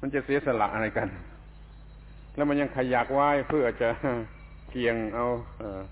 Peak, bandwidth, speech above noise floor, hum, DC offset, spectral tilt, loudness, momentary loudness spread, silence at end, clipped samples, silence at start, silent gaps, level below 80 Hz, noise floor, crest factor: -10 dBFS; 4 kHz; 20 dB; none; under 0.1%; -10 dB/octave; -28 LUFS; 15 LU; 0 s; under 0.1%; 0 s; none; -48 dBFS; -47 dBFS; 18 dB